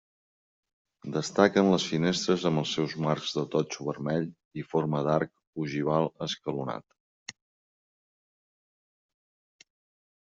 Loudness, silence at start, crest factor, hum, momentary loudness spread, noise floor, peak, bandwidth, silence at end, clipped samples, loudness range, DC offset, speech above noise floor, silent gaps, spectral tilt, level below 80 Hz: -28 LUFS; 1.05 s; 24 dB; none; 16 LU; under -90 dBFS; -6 dBFS; 8 kHz; 2.9 s; under 0.1%; 11 LU; under 0.1%; over 62 dB; 4.45-4.51 s, 5.47-5.53 s, 7.00-7.26 s; -5.5 dB/octave; -68 dBFS